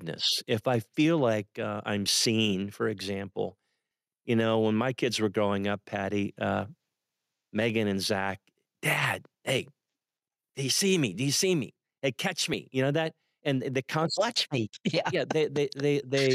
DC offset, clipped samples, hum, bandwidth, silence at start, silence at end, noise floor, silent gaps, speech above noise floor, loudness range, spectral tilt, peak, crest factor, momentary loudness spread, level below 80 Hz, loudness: under 0.1%; under 0.1%; none; 15.5 kHz; 0 s; 0 s; under -90 dBFS; none; over 62 dB; 3 LU; -4 dB/octave; -14 dBFS; 14 dB; 9 LU; -76 dBFS; -29 LUFS